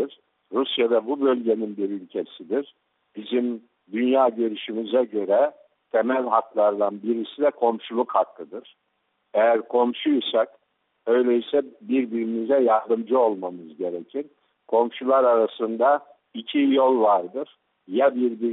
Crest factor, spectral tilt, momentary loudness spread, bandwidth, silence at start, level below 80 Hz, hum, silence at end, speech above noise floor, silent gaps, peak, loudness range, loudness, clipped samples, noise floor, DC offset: 18 dB; -3 dB/octave; 13 LU; 4.1 kHz; 0 s; -76 dBFS; none; 0 s; 48 dB; none; -6 dBFS; 4 LU; -23 LUFS; under 0.1%; -71 dBFS; under 0.1%